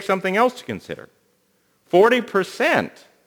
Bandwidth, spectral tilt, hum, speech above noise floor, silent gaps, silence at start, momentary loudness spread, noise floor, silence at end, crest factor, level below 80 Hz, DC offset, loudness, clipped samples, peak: over 20 kHz; -5 dB/octave; none; 45 dB; none; 0 s; 18 LU; -64 dBFS; 0.4 s; 18 dB; -68 dBFS; under 0.1%; -19 LUFS; under 0.1%; -2 dBFS